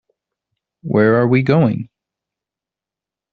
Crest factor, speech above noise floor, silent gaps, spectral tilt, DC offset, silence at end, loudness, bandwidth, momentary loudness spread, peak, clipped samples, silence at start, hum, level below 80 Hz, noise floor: 18 dB; 74 dB; none; -7.5 dB/octave; under 0.1%; 1.45 s; -15 LUFS; 4.9 kHz; 19 LU; -2 dBFS; under 0.1%; 0.85 s; none; -56 dBFS; -88 dBFS